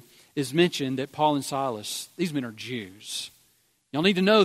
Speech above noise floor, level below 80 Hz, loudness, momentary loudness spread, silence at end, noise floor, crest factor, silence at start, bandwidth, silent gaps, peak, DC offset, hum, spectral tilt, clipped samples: 41 dB; -70 dBFS; -27 LUFS; 11 LU; 0 s; -66 dBFS; 20 dB; 0.35 s; 16 kHz; none; -6 dBFS; under 0.1%; none; -4.5 dB/octave; under 0.1%